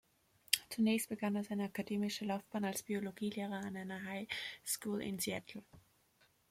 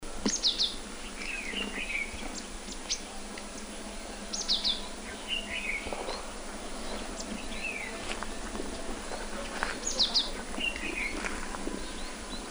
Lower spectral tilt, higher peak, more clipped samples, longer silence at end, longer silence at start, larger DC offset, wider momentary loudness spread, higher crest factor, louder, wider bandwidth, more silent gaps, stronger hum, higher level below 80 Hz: first, -3.5 dB/octave vs -1.5 dB/octave; about the same, -10 dBFS vs -10 dBFS; neither; first, 0.7 s vs 0 s; first, 0.5 s vs 0 s; neither; second, 9 LU vs 13 LU; first, 30 dB vs 24 dB; second, -39 LUFS vs -33 LUFS; second, 16.5 kHz vs over 20 kHz; neither; neither; second, -78 dBFS vs -44 dBFS